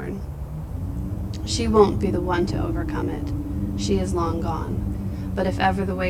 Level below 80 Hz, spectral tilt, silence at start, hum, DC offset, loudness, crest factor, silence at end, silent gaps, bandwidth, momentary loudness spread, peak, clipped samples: -32 dBFS; -6.5 dB/octave; 0 s; none; under 0.1%; -24 LUFS; 22 dB; 0 s; none; 16 kHz; 12 LU; -2 dBFS; under 0.1%